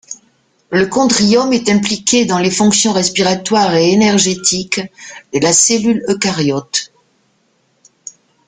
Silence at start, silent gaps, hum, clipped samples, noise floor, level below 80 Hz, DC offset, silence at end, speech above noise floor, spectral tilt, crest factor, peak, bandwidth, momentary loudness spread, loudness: 0.1 s; none; none; under 0.1%; -59 dBFS; -52 dBFS; under 0.1%; 1.6 s; 46 dB; -3 dB/octave; 14 dB; 0 dBFS; 9.8 kHz; 21 LU; -12 LUFS